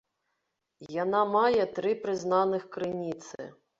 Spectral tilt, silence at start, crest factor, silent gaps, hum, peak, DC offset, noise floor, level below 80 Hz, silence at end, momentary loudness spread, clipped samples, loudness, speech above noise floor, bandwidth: -5.5 dB/octave; 0.8 s; 18 dB; none; none; -12 dBFS; under 0.1%; -81 dBFS; -70 dBFS; 0.3 s; 14 LU; under 0.1%; -28 LUFS; 53 dB; 7.8 kHz